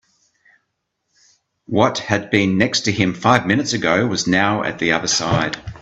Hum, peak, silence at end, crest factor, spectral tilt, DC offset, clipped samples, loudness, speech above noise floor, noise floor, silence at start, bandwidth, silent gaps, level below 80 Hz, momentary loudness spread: none; 0 dBFS; 0 s; 18 dB; -4 dB/octave; under 0.1%; under 0.1%; -17 LUFS; 56 dB; -74 dBFS; 1.7 s; 8.4 kHz; none; -50 dBFS; 4 LU